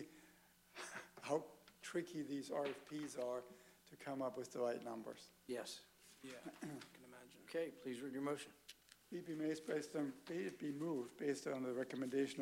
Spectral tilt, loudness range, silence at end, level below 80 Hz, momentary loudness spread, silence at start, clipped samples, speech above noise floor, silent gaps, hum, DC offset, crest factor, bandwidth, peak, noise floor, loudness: -5 dB/octave; 5 LU; 0 s; -86 dBFS; 16 LU; 0 s; under 0.1%; 24 dB; none; none; under 0.1%; 20 dB; 16 kHz; -28 dBFS; -70 dBFS; -47 LUFS